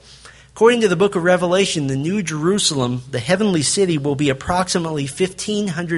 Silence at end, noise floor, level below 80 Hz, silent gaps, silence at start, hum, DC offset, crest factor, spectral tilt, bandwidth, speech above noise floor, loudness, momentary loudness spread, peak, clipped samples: 0 s; -43 dBFS; -48 dBFS; none; 0.1 s; none; under 0.1%; 18 dB; -4.5 dB/octave; 11.5 kHz; 26 dB; -18 LUFS; 7 LU; -2 dBFS; under 0.1%